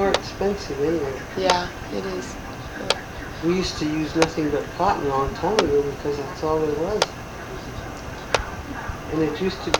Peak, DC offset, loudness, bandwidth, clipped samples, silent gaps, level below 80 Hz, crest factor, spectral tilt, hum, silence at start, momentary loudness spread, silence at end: 0 dBFS; under 0.1%; -25 LUFS; 19 kHz; under 0.1%; none; -40 dBFS; 24 dB; -4.5 dB/octave; none; 0 s; 12 LU; 0 s